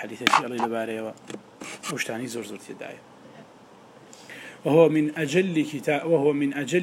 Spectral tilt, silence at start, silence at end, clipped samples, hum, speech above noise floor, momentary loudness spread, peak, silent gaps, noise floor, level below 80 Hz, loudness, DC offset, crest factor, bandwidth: -5 dB/octave; 0 s; 0 s; under 0.1%; none; 26 dB; 21 LU; 0 dBFS; none; -50 dBFS; -76 dBFS; -24 LUFS; under 0.1%; 26 dB; 16 kHz